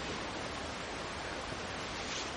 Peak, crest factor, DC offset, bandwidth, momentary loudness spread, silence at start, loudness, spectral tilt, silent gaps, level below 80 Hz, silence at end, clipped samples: -24 dBFS; 16 dB; under 0.1%; 10 kHz; 2 LU; 0 s; -39 LUFS; -3 dB/octave; none; -54 dBFS; 0 s; under 0.1%